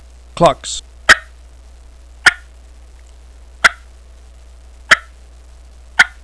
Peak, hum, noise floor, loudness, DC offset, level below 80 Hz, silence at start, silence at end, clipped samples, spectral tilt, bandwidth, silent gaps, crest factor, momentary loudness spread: 0 dBFS; none; -40 dBFS; -13 LUFS; 0.3%; -38 dBFS; 0.35 s; 0.15 s; 0.4%; -2 dB/octave; 11 kHz; none; 18 dB; 13 LU